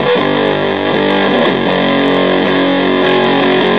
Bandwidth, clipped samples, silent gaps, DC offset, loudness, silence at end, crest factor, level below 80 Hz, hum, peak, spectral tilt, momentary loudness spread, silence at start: 6.4 kHz; under 0.1%; none; 0.8%; -11 LUFS; 0 s; 12 dB; -58 dBFS; none; 0 dBFS; -7 dB/octave; 2 LU; 0 s